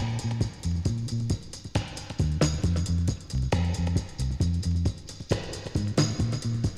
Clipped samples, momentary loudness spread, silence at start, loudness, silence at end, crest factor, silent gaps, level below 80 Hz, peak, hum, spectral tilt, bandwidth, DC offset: under 0.1%; 6 LU; 0 s; -29 LUFS; 0 s; 18 dB; none; -36 dBFS; -10 dBFS; none; -6 dB/octave; 12 kHz; under 0.1%